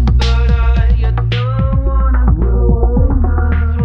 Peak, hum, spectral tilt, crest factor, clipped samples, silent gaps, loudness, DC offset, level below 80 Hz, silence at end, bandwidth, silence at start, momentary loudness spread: -2 dBFS; none; -8 dB/octave; 10 dB; under 0.1%; none; -14 LUFS; under 0.1%; -12 dBFS; 0 s; 6.2 kHz; 0 s; 2 LU